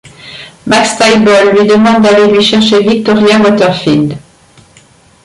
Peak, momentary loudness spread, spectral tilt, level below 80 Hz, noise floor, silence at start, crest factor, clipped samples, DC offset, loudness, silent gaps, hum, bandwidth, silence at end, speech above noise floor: 0 dBFS; 17 LU; -4.5 dB/octave; -44 dBFS; -42 dBFS; 0.05 s; 8 dB; under 0.1%; under 0.1%; -7 LUFS; none; none; 11.5 kHz; 1.05 s; 36 dB